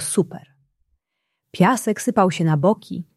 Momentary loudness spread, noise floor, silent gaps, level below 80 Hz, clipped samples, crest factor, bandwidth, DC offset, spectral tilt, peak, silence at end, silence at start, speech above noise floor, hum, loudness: 12 LU; -78 dBFS; none; -64 dBFS; under 0.1%; 18 dB; 13.5 kHz; under 0.1%; -5.5 dB/octave; -2 dBFS; 0.15 s; 0 s; 58 dB; none; -20 LUFS